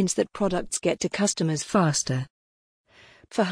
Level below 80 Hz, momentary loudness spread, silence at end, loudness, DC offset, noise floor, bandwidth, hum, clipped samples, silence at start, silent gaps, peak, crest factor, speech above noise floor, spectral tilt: -54 dBFS; 8 LU; 0 s; -25 LUFS; under 0.1%; -54 dBFS; 10.5 kHz; none; under 0.1%; 0 s; 2.30-2.85 s; -10 dBFS; 16 dB; 29 dB; -4.5 dB/octave